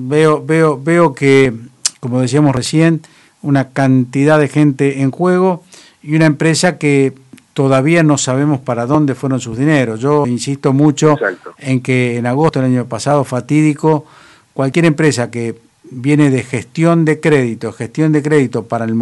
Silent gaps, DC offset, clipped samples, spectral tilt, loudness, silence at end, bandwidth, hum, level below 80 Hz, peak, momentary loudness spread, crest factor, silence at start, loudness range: none; under 0.1%; under 0.1%; -6 dB/octave; -13 LUFS; 0 s; 11.5 kHz; none; -52 dBFS; 0 dBFS; 8 LU; 12 dB; 0 s; 2 LU